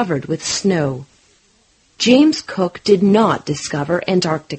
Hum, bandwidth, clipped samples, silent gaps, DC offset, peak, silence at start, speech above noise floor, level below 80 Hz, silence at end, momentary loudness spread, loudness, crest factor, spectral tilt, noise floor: none; 8.8 kHz; under 0.1%; none; under 0.1%; 0 dBFS; 0 s; 40 dB; -54 dBFS; 0 s; 10 LU; -16 LUFS; 16 dB; -5 dB/octave; -56 dBFS